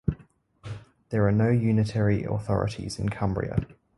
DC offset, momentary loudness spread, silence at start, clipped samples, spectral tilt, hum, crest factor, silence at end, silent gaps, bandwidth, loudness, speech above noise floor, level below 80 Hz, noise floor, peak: under 0.1%; 19 LU; 0.05 s; under 0.1%; -8 dB/octave; none; 18 dB; 0.35 s; none; 11.5 kHz; -26 LUFS; 31 dB; -44 dBFS; -56 dBFS; -8 dBFS